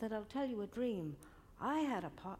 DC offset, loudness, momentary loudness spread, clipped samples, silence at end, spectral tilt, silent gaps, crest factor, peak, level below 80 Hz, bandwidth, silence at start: under 0.1%; -41 LUFS; 11 LU; under 0.1%; 0 s; -6.5 dB/octave; none; 16 dB; -26 dBFS; -66 dBFS; 16 kHz; 0 s